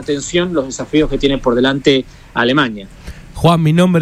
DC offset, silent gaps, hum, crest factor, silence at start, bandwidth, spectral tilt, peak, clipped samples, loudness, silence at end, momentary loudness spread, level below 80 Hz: under 0.1%; none; none; 14 dB; 0 s; 14 kHz; -5.5 dB/octave; 0 dBFS; under 0.1%; -14 LUFS; 0 s; 14 LU; -32 dBFS